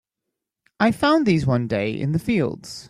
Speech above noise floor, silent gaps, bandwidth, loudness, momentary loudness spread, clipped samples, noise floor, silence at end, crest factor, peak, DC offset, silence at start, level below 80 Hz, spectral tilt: 62 dB; none; 15 kHz; -21 LUFS; 7 LU; under 0.1%; -83 dBFS; 0.05 s; 16 dB; -6 dBFS; under 0.1%; 0.8 s; -52 dBFS; -7 dB/octave